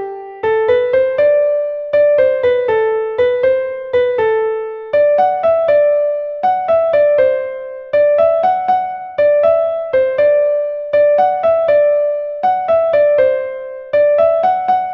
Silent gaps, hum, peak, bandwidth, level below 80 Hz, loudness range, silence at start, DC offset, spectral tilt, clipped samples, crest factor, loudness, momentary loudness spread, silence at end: none; none; -2 dBFS; 5.6 kHz; -54 dBFS; 1 LU; 0 s; under 0.1%; -6.5 dB/octave; under 0.1%; 12 dB; -14 LUFS; 7 LU; 0 s